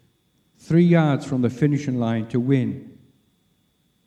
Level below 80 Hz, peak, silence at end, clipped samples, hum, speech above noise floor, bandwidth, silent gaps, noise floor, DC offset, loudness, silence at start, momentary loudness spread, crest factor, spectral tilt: -62 dBFS; -4 dBFS; 1.15 s; under 0.1%; none; 46 dB; 8.8 kHz; none; -66 dBFS; under 0.1%; -21 LUFS; 0.7 s; 7 LU; 18 dB; -8.5 dB/octave